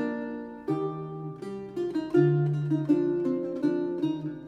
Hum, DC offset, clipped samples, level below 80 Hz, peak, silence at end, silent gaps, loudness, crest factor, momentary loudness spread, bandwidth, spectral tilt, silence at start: none; under 0.1%; under 0.1%; -66 dBFS; -10 dBFS; 0 s; none; -29 LUFS; 18 dB; 13 LU; 7.4 kHz; -9.5 dB/octave; 0 s